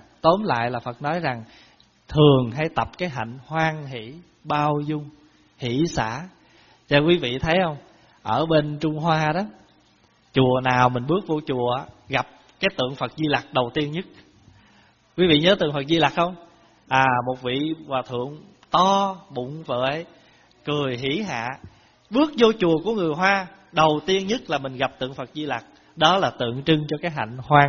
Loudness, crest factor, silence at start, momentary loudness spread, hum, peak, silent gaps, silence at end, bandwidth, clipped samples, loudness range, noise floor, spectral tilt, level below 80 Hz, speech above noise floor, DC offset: -22 LUFS; 22 dB; 0.25 s; 14 LU; none; 0 dBFS; none; 0 s; 7 kHz; under 0.1%; 5 LU; -59 dBFS; -4 dB/octave; -52 dBFS; 37 dB; under 0.1%